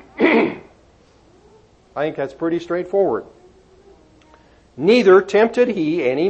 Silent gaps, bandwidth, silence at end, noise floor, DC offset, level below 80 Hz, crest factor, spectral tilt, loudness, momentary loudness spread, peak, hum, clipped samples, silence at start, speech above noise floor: none; 8.4 kHz; 0 s; -52 dBFS; under 0.1%; -58 dBFS; 16 dB; -6.5 dB/octave; -17 LUFS; 13 LU; -2 dBFS; none; under 0.1%; 0.15 s; 35 dB